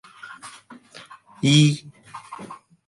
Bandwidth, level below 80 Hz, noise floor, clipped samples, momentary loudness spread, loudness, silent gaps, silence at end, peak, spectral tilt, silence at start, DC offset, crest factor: 11.5 kHz; -66 dBFS; -46 dBFS; under 0.1%; 27 LU; -19 LUFS; none; 0.3 s; -4 dBFS; -5 dB/octave; 0.25 s; under 0.1%; 20 dB